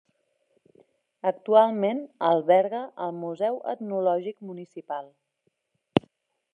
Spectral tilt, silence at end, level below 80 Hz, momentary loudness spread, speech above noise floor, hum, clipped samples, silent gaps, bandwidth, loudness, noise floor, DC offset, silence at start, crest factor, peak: -8 dB/octave; 0.55 s; -70 dBFS; 16 LU; 50 dB; none; under 0.1%; none; 4.6 kHz; -26 LUFS; -75 dBFS; under 0.1%; 1.25 s; 26 dB; -2 dBFS